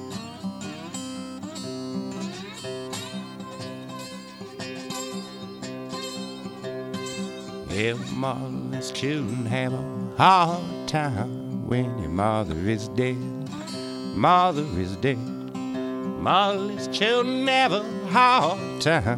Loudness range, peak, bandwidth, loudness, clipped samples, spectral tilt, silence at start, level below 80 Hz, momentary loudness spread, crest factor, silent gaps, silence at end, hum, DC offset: 12 LU; -4 dBFS; 16 kHz; -26 LUFS; under 0.1%; -5 dB/octave; 0 s; -54 dBFS; 16 LU; 22 dB; none; 0 s; none; under 0.1%